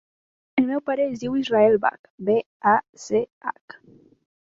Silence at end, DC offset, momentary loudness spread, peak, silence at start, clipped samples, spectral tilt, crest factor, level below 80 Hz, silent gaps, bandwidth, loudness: 1 s; under 0.1%; 12 LU; -6 dBFS; 0.55 s; under 0.1%; -5.5 dB/octave; 18 dB; -62 dBFS; 1.99-2.04 s, 2.10-2.18 s, 2.46-2.60 s, 2.89-2.93 s, 3.32-3.41 s; 7.8 kHz; -23 LUFS